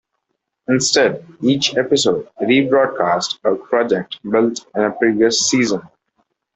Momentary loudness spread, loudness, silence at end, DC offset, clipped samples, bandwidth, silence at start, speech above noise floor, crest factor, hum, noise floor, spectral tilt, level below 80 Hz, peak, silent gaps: 7 LU; -17 LUFS; 0.7 s; under 0.1%; under 0.1%; 8.4 kHz; 0.7 s; 58 dB; 16 dB; none; -74 dBFS; -3.5 dB/octave; -60 dBFS; -2 dBFS; none